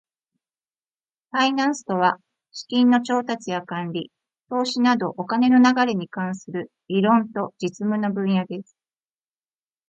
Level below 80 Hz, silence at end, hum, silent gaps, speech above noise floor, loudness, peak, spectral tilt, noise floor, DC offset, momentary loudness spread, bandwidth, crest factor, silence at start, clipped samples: -72 dBFS; 1.25 s; none; none; over 69 dB; -22 LUFS; -4 dBFS; -5.5 dB/octave; under -90 dBFS; under 0.1%; 15 LU; 8 kHz; 18 dB; 1.35 s; under 0.1%